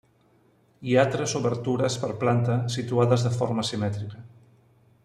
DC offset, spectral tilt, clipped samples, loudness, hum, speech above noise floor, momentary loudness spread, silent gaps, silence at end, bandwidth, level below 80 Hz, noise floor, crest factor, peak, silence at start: under 0.1%; -6 dB/octave; under 0.1%; -25 LUFS; none; 37 dB; 10 LU; none; 0.8 s; 11.5 kHz; -62 dBFS; -62 dBFS; 18 dB; -8 dBFS; 0.8 s